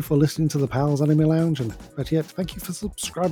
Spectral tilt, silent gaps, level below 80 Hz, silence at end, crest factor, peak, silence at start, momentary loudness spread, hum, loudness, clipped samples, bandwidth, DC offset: -6.5 dB/octave; none; -46 dBFS; 0 s; 16 dB; -6 dBFS; 0 s; 12 LU; none; -23 LUFS; under 0.1%; 18 kHz; under 0.1%